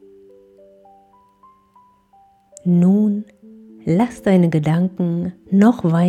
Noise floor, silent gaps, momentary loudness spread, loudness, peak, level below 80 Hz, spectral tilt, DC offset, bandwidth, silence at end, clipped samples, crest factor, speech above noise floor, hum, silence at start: -54 dBFS; none; 12 LU; -17 LUFS; -4 dBFS; -58 dBFS; -9 dB/octave; under 0.1%; 9.6 kHz; 0 s; under 0.1%; 16 dB; 38 dB; none; 2.65 s